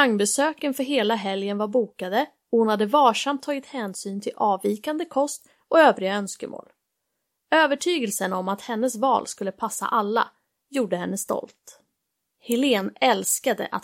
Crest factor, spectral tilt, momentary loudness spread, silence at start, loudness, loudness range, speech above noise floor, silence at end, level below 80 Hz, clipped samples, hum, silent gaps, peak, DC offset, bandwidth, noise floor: 20 dB; -3.5 dB/octave; 12 LU; 0 s; -23 LUFS; 4 LU; 55 dB; 0.05 s; -78 dBFS; under 0.1%; none; none; -4 dBFS; under 0.1%; 16.5 kHz; -79 dBFS